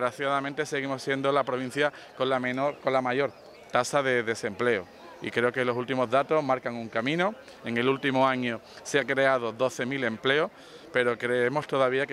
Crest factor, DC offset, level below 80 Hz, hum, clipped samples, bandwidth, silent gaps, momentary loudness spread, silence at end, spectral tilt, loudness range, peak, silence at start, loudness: 20 dB; under 0.1%; -72 dBFS; none; under 0.1%; 14 kHz; none; 7 LU; 0 s; -4.5 dB/octave; 1 LU; -8 dBFS; 0 s; -27 LUFS